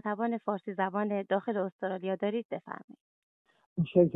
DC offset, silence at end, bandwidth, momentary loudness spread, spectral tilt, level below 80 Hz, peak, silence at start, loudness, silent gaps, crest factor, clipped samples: under 0.1%; 0 s; 4 kHz; 10 LU; -10.5 dB/octave; -72 dBFS; -10 dBFS; 0.05 s; -33 LUFS; 1.72-1.79 s, 2.45-2.50 s, 2.84-2.88 s, 3.01-3.45 s, 3.66-3.76 s; 22 dB; under 0.1%